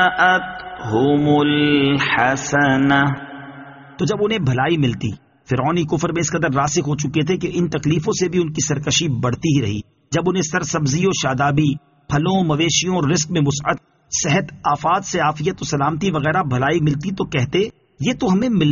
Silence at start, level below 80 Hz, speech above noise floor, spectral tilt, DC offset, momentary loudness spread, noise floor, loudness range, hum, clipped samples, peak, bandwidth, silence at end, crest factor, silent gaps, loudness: 0 s; -46 dBFS; 21 dB; -4.5 dB/octave; under 0.1%; 9 LU; -38 dBFS; 3 LU; none; under 0.1%; -2 dBFS; 7.4 kHz; 0 s; 16 dB; none; -18 LUFS